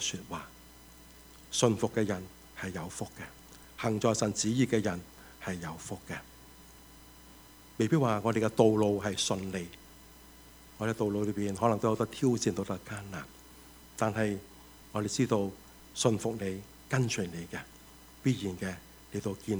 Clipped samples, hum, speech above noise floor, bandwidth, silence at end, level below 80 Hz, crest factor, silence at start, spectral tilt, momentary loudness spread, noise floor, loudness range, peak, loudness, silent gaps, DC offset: under 0.1%; none; 23 dB; over 20 kHz; 0 s; -60 dBFS; 24 dB; 0 s; -5 dB/octave; 24 LU; -54 dBFS; 5 LU; -8 dBFS; -32 LUFS; none; under 0.1%